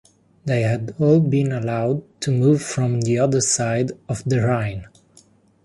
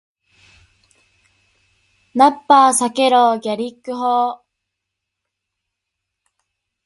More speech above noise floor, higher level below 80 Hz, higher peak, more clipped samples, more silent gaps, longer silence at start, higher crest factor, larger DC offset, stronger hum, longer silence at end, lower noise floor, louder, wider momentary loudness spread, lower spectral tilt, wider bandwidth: second, 35 dB vs 65 dB; first, -52 dBFS vs -66 dBFS; second, -4 dBFS vs 0 dBFS; neither; neither; second, 0.45 s vs 2.15 s; about the same, 16 dB vs 20 dB; neither; neither; second, 0.8 s vs 2.5 s; second, -54 dBFS vs -80 dBFS; second, -20 LUFS vs -15 LUFS; second, 8 LU vs 14 LU; first, -6 dB/octave vs -2.5 dB/octave; about the same, 11.5 kHz vs 11.5 kHz